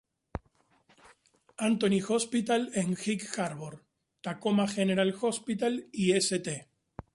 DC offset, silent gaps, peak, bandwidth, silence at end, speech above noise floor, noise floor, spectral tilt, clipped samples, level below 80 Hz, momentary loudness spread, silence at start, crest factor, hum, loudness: under 0.1%; none; -14 dBFS; 11.5 kHz; 0.5 s; 39 dB; -68 dBFS; -4.5 dB/octave; under 0.1%; -60 dBFS; 18 LU; 0.35 s; 18 dB; none; -30 LUFS